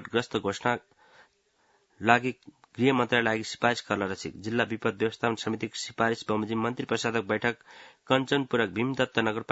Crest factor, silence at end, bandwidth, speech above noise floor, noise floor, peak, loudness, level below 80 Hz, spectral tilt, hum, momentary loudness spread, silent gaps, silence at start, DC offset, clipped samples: 26 dB; 0.1 s; 8 kHz; 40 dB; -68 dBFS; -2 dBFS; -28 LUFS; -66 dBFS; -5 dB/octave; none; 8 LU; none; 0 s; under 0.1%; under 0.1%